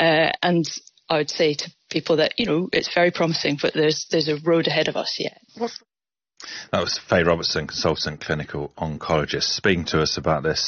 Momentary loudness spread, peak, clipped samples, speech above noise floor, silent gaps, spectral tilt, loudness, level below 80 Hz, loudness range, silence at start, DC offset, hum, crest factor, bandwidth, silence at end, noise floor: 11 LU; -6 dBFS; under 0.1%; 58 dB; none; -4.5 dB/octave; -22 LUFS; -52 dBFS; 3 LU; 0 s; under 0.1%; none; 16 dB; 7.2 kHz; 0 s; -80 dBFS